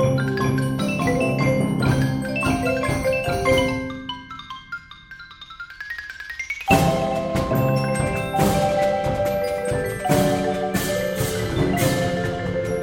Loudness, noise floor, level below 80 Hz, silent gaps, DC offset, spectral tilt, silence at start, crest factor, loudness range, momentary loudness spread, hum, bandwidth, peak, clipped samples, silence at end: -22 LUFS; -41 dBFS; -40 dBFS; none; under 0.1%; -5.5 dB/octave; 0 s; 20 dB; 5 LU; 15 LU; none; 17.5 kHz; -2 dBFS; under 0.1%; 0 s